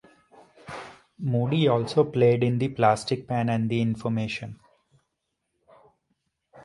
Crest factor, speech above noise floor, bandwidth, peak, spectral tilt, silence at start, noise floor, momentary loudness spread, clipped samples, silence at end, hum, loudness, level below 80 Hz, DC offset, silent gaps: 20 dB; 56 dB; 11.5 kHz; -6 dBFS; -7 dB/octave; 0.65 s; -79 dBFS; 19 LU; under 0.1%; 0.05 s; none; -24 LUFS; -60 dBFS; under 0.1%; none